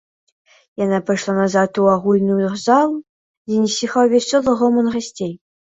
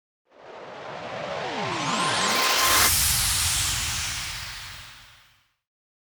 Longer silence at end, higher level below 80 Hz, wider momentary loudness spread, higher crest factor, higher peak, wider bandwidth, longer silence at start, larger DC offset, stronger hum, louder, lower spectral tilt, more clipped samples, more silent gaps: second, 0.4 s vs 1.05 s; second, -58 dBFS vs -42 dBFS; second, 10 LU vs 21 LU; about the same, 16 dB vs 20 dB; first, -2 dBFS vs -6 dBFS; second, 8 kHz vs over 20 kHz; first, 0.8 s vs 0.4 s; neither; neither; first, -17 LUFS vs -22 LUFS; first, -5.5 dB/octave vs -1 dB/octave; neither; first, 3.09-3.45 s vs none